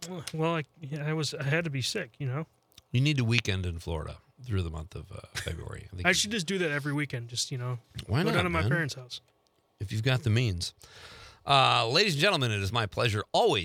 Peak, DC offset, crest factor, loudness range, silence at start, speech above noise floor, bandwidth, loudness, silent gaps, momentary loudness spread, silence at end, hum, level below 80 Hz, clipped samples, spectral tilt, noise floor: -4 dBFS; under 0.1%; 24 dB; 5 LU; 0 s; 22 dB; 16 kHz; -29 LUFS; none; 18 LU; 0 s; none; -54 dBFS; under 0.1%; -4.5 dB/octave; -51 dBFS